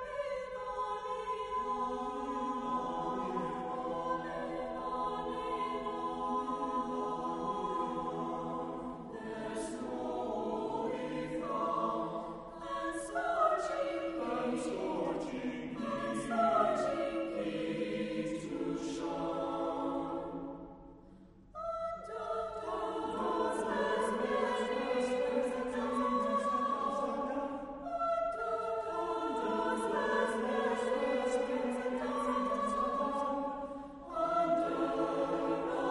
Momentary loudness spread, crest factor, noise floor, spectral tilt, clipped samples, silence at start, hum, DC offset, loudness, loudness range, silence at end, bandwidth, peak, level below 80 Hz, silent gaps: 7 LU; 18 dB; -57 dBFS; -5 dB/octave; under 0.1%; 0 s; none; under 0.1%; -36 LUFS; 5 LU; 0 s; 11.5 kHz; -18 dBFS; -62 dBFS; none